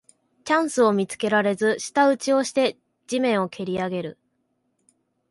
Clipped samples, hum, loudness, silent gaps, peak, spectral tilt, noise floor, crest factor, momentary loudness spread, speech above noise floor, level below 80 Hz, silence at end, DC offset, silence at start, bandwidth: under 0.1%; none; -22 LUFS; none; -6 dBFS; -4.5 dB/octave; -72 dBFS; 18 dB; 9 LU; 50 dB; -66 dBFS; 1.2 s; under 0.1%; 0.45 s; 11.5 kHz